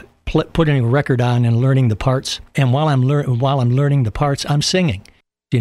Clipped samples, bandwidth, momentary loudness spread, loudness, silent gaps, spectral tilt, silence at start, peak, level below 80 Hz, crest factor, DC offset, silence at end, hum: under 0.1%; 12 kHz; 6 LU; -17 LUFS; none; -6.5 dB/octave; 0.25 s; -4 dBFS; -36 dBFS; 12 dB; under 0.1%; 0 s; none